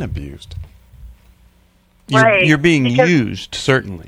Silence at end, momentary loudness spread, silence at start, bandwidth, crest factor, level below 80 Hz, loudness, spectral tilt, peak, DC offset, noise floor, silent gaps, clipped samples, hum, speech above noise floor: 0.05 s; 22 LU; 0 s; 13 kHz; 16 dB; -40 dBFS; -14 LUFS; -5.5 dB/octave; 0 dBFS; under 0.1%; -54 dBFS; none; under 0.1%; none; 39 dB